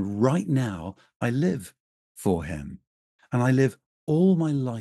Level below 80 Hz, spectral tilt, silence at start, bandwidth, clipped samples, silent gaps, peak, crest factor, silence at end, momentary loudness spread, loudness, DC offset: -54 dBFS; -8 dB/octave; 0 s; 12.5 kHz; under 0.1%; 1.16-1.20 s, 1.80-2.15 s, 2.87-3.19 s, 3.86-4.07 s; -8 dBFS; 18 dB; 0 s; 16 LU; -25 LUFS; under 0.1%